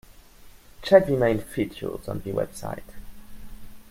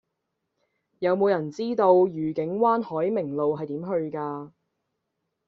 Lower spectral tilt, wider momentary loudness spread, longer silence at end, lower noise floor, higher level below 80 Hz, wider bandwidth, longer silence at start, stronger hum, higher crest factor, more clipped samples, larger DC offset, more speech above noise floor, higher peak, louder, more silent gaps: about the same, -6.5 dB/octave vs -6.5 dB/octave; first, 18 LU vs 11 LU; second, 0.1 s vs 1 s; second, -48 dBFS vs -80 dBFS; first, -46 dBFS vs -70 dBFS; first, 16 kHz vs 6.8 kHz; second, 0.1 s vs 1 s; neither; about the same, 24 dB vs 20 dB; neither; neither; second, 25 dB vs 56 dB; first, -2 dBFS vs -6 dBFS; about the same, -24 LUFS vs -25 LUFS; neither